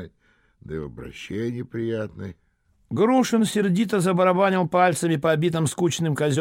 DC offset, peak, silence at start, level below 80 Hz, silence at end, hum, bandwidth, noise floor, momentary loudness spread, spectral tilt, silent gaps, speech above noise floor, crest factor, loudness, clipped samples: under 0.1%; -6 dBFS; 0 s; -56 dBFS; 0 s; none; 16.5 kHz; -63 dBFS; 15 LU; -5.5 dB/octave; none; 41 dB; 16 dB; -22 LUFS; under 0.1%